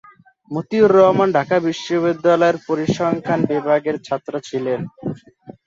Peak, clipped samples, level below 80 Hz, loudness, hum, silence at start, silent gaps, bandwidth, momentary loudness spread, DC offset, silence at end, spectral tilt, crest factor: -2 dBFS; under 0.1%; -58 dBFS; -18 LUFS; none; 0.5 s; none; 7.8 kHz; 15 LU; under 0.1%; 0.15 s; -6.5 dB/octave; 16 dB